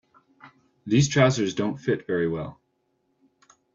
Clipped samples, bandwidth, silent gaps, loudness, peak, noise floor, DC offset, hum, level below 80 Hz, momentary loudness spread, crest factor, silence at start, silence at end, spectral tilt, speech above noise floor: under 0.1%; 7.8 kHz; none; -24 LUFS; -6 dBFS; -72 dBFS; under 0.1%; none; -58 dBFS; 14 LU; 20 dB; 0.45 s; 1.2 s; -5.5 dB/octave; 49 dB